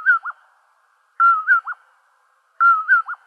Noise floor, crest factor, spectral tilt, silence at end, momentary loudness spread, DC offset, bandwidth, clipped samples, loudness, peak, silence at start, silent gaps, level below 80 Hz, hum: -61 dBFS; 14 dB; 7 dB/octave; 0.15 s; 19 LU; under 0.1%; 4.9 kHz; under 0.1%; -16 LUFS; -6 dBFS; 0 s; none; under -90 dBFS; none